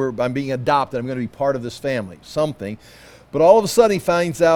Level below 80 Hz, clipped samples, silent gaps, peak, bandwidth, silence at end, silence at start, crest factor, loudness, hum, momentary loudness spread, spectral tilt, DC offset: -52 dBFS; under 0.1%; none; 0 dBFS; 18 kHz; 0 s; 0 s; 18 dB; -19 LUFS; none; 15 LU; -5.5 dB/octave; under 0.1%